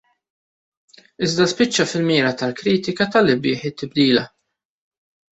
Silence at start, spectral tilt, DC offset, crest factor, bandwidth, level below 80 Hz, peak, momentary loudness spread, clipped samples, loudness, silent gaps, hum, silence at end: 1.2 s; -4.5 dB/octave; under 0.1%; 18 dB; 8.2 kHz; -58 dBFS; -2 dBFS; 7 LU; under 0.1%; -19 LUFS; none; none; 1.05 s